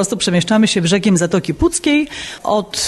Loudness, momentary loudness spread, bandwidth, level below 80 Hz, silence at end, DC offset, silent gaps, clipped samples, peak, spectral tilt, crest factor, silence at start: -15 LUFS; 5 LU; 12.5 kHz; -36 dBFS; 0 s; under 0.1%; none; under 0.1%; -4 dBFS; -4.5 dB/octave; 12 dB; 0 s